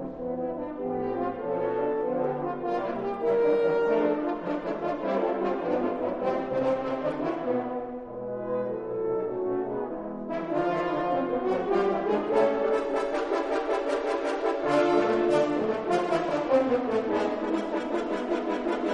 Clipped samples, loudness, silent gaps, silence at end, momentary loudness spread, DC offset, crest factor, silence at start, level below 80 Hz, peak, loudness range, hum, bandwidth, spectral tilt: under 0.1%; -28 LUFS; none; 0 s; 8 LU; under 0.1%; 18 dB; 0 s; -58 dBFS; -10 dBFS; 5 LU; none; 10.5 kHz; -6.5 dB/octave